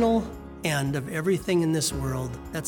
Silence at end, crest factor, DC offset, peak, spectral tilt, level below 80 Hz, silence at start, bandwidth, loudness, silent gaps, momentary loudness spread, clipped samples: 0 s; 14 dB; under 0.1%; -12 dBFS; -5 dB/octave; -44 dBFS; 0 s; over 20 kHz; -27 LUFS; none; 8 LU; under 0.1%